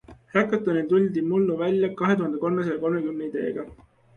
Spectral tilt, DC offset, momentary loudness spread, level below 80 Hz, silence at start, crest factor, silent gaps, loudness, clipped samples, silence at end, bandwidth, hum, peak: -8.5 dB/octave; under 0.1%; 7 LU; -60 dBFS; 0.1 s; 18 dB; none; -24 LUFS; under 0.1%; 0.4 s; 6.8 kHz; none; -8 dBFS